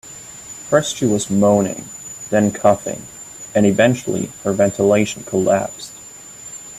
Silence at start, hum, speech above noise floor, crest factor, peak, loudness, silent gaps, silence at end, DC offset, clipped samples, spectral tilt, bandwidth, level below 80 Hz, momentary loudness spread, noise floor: 0.05 s; none; 21 dB; 18 dB; 0 dBFS; -17 LUFS; none; 0 s; under 0.1%; under 0.1%; -5 dB/octave; 15 kHz; -54 dBFS; 18 LU; -38 dBFS